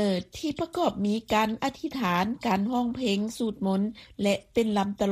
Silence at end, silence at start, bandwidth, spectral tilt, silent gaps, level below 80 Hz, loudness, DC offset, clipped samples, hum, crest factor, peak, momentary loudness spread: 0 s; 0 s; 15.5 kHz; -5.5 dB/octave; none; -56 dBFS; -28 LUFS; under 0.1%; under 0.1%; none; 18 dB; -10 dBFS; 5 LU